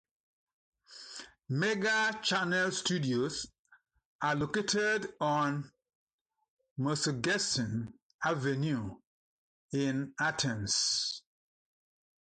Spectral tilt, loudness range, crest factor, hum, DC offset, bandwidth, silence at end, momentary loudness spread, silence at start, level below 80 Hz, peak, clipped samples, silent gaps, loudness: -3.5 dB/octave; 2 LU; 16 dB; none; under 0.1%; 9.4 kHz; 1.05 s; 16 LU; 0.9 s; -66 dBFS; -18 dBFS; under 0.1%; 3.59-3.65 s, 4.05-4.19 s, 5.95-6.07 s, 6.13-6.25 s, 6.50-6.57 s, 6.71-6.76 s, 8.02-8.19 s, 9.07-9.68 s; -32 LUFS